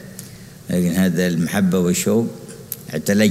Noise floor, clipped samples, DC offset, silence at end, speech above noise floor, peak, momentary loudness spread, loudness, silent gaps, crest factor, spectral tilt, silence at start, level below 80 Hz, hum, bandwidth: -38 dBFS; under 0.1%; under 0.1%; 0 s; 20 dB; -2 dBFS; 19 LU; -19 LUFS; none; 18 dB; -5.5 dB/octave; 0 s; -52 dBFS; none; 16 kHz